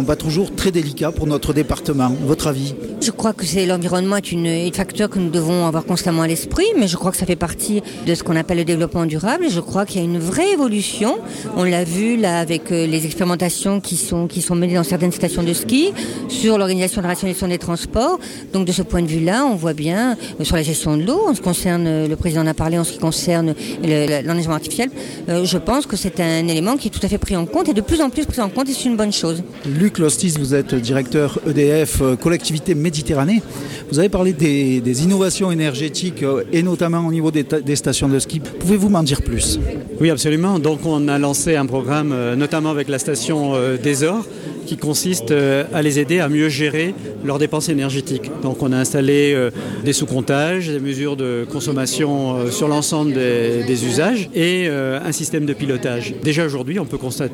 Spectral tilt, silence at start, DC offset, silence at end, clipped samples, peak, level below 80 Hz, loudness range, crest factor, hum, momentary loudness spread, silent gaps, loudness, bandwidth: -5 dB/octave; 0 s; under 0.1%; 0 s; under 0.1%; -2 dBFS; -38 dBFS; 2 LU; 14 dB; none; 5 LU; none; -18 LUFS; 17 kHz